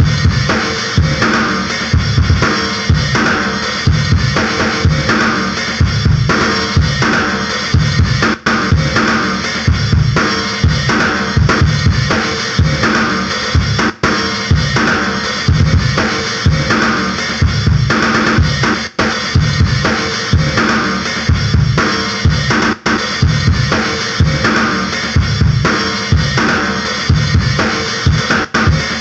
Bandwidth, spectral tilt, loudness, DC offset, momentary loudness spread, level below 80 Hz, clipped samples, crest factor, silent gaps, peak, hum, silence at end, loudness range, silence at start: 8.4 kHz; -5 dB/octave; -13 LUFS; under 0.1%; 3 LU; -24 dBFS; under 0.1%; 12 dB; none; 0 dBFS; none; 0 s; 1 LU; 0 s